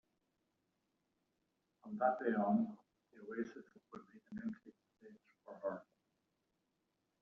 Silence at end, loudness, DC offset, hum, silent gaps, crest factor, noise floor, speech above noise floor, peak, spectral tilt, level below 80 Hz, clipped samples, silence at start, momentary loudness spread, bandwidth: 1.4 s; -41 LUFS; under 0.1%; none; none; 22 dB; -85 dBFS; 45 dB; -22 dBFS; -7.5 dB/octave; -86 dBFS; under 0.1%; 1.85 s; 23 LU; 6.2 kHz